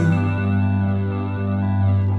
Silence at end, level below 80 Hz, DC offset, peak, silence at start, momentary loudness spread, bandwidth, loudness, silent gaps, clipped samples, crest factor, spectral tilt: 0 s; -50 dBFS; under 0.1%; -8 dBFS; 0 s; 4 LU; 4.2 kHz; -21 LUFS; none; under 0.1%; 10 dB; -9.5 dB/octave